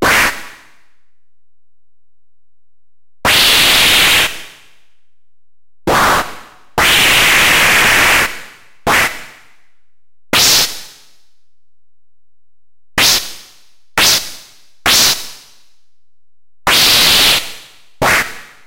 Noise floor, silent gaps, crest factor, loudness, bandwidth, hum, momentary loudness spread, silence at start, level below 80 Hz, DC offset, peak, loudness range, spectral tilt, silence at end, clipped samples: -77 dBFS; none; 16 dB; -10 LUFS; 16 kHz; none; 17 LU; 0 s; -38 dBFS; under 0.1%; 0 dBFS; 6 LU; -0.5 dB/octave; 0.25 s; under 0.1%